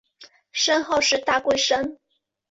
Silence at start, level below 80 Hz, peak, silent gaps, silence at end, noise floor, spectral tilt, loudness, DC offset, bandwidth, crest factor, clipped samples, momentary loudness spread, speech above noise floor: 0.2 s; -58 dBFS; -8 dBFS; none; 0.55 s; -52 dBFS; -1 dB/octave; -21 LUFS; under 0.1%; 8.2 kHz; 16 dB; under 0.1%; 8 LU; 30 dB